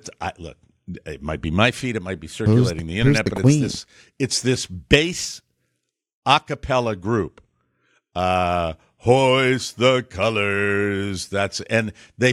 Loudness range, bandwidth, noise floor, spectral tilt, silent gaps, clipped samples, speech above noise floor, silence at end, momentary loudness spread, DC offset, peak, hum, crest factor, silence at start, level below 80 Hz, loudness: 3 LU; 13.5 kHz; -76 dBFS; -5 dB/octave; 6.13-6.22 s; under 0.1%; 55 dB; 0 s; 14 LU; under 0.1%; 0 dBFS; none; 22 dB; 0.05 s; -42 dBFS; -21 LUFS